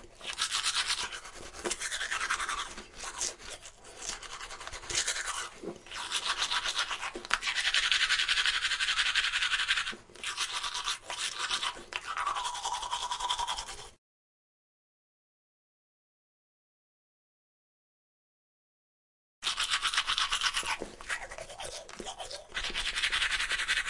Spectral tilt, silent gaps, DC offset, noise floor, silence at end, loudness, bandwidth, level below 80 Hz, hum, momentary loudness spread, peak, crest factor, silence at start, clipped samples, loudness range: 1 dB/octave; 13.98-19.42 s; under 0.1%; under -90 dBFS; 0 s; -31 LUFS; 11.5 kHz; -56 dBFS; none; 15 LU; -6 dBFS; 28 dB; 0 s; under 0.1%; 9 LU